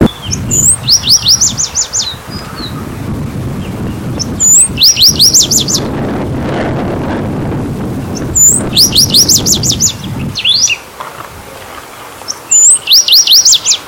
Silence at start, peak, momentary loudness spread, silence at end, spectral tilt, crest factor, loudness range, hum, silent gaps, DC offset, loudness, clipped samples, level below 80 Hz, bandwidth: 0 s; 0 dBFS; 19 LU; 0 s; -1.5 dB/octave; 10 dB; 5 LU; none; none; under 0.1%; -6 LUFS; 0.8%; -32 dBFS; over 20 kHz